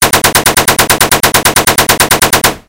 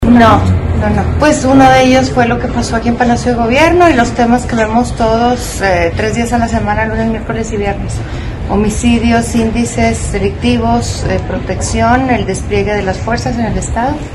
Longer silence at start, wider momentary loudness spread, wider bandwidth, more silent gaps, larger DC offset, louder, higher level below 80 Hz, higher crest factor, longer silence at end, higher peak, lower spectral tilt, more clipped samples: about the same, 0 s vs 0 s; second, 1 LU vs 9 LU; first, over 20 kHz vs 12.5 kHz; neither; first, 0.8% vs under 0.1%; first, -7 LUFS vs -12 LUFS; second, -30 dBFS vs -22 dBFS; about the same, 8 dB vs 10 dB; about the same, 0.1 s vs 0 s; about the same, 0 dBFS vs 0 dBFS; second, -1.5 dB/octave vs -5.5 dB/octave; first, 4% vs 0.9%